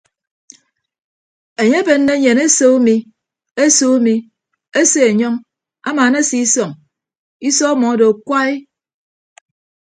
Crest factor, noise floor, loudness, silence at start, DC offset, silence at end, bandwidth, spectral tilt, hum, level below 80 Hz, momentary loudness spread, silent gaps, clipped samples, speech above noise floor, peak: 16 dB; -55 dBFS; -13 LUFS; 1.6 s; under 0.1%; 1.3 s; 9.6 kHz; -3 dB/octave; none; -64 dBFS; 12 LU; 7.19-7.40 s; under 0.1%; 43 dB; 0 dBFS